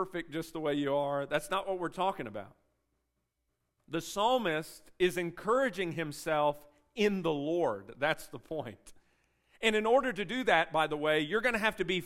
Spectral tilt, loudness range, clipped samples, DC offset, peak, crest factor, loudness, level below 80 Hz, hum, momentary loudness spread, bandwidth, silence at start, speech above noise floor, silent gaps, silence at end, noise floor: -4.5 dB/octave; 5 LU; under 0.1%; under 0.1%; -10 dBFS; 22 dB; -32 LUFS; -62 dBFS; none; 12 LU; 16 kHz; 0 s; 50 dB; none; 0 s; -82 dBFS